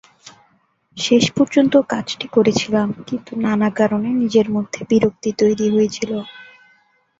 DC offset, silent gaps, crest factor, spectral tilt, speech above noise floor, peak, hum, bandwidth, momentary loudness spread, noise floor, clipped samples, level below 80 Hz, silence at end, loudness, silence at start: under 0.1%; none; 16 dB; -5 dB/octave; 43 dB; -2 dBFS; none; 7.8 kHz; 10 LU; -60 dBFS; under 0.1%; -56 dBFS; 0.75 s; -18 LUFS; 0.25 s